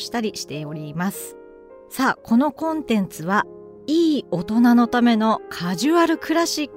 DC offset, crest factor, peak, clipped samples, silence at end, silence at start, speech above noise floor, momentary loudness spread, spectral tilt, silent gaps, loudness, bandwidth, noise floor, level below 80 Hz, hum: under 0.1%; 14 dB; -6 dBFS; under 0.1%; 0 s; 0 s; 24 dB; 14 LU; -5 dB/octave; none; -20 LUFS; 16 kHz; -44 dBFS; -58 dBFS; none